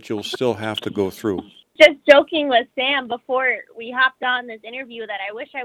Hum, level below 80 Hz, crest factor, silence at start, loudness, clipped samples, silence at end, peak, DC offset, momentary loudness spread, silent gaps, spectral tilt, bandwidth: none; -62 dBFS; 20 dB; 0.05 s; -18 LUFS; under 0.1%; 0 s; 0 dBFS; under 0.1%; 16 LU; none; -4 dB/octave; 14 kHz